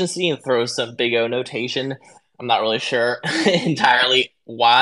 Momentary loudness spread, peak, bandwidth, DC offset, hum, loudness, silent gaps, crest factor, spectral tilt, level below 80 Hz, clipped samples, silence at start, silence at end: 10 LU; 0 dBFS; 12 kHz; under 0.1%; none; -19 LUFS; none; 20 dB; -3.5 dB/octave; -70 dBFS; under 0.1%; 0 s; 0 s